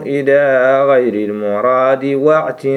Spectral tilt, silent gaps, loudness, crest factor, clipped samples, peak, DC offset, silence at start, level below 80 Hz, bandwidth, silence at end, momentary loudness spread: -7.5 dB/octave; none; -13 LUFS; 12 dB; under 0.1%; 0 dBFS; under 0.1%; 0 s; -66 dBFS; 11.5 kHz; 0 s; 6 LU